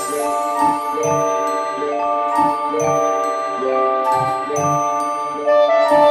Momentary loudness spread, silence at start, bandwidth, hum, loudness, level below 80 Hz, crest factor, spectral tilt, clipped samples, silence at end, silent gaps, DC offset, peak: 7 LU; 0 s; 16 kHz; none; -18 LUFS; -60 dBFS; 16 dB; -4.5 dB/octave; under 0.1%; 0 s; none; under 0.1%; -2 dBFS